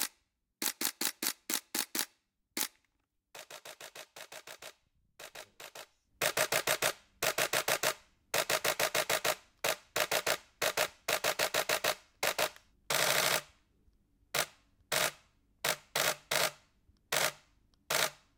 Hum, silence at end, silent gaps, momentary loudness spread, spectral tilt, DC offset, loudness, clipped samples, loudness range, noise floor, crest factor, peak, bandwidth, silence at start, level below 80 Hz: none; 0.25 s; none; 18 LU; -0.5 dB/octave; under 0.1%; -32 LUFS; under 0.1%; 10 LU; -80 dBFS; 26 dB; -10 dBFS; 19 kHz; 0 s; -70 dBFS